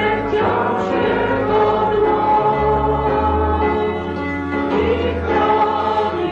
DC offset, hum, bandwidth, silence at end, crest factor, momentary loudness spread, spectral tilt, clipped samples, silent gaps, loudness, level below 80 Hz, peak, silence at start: under 0.1%; none; 7.2 kHz; 0 s; 12 dB; 5 LU; -8 dB/octave; under 0.1%; none; -17 LUFS; -30 dBFS; -6 dBFS; 0 s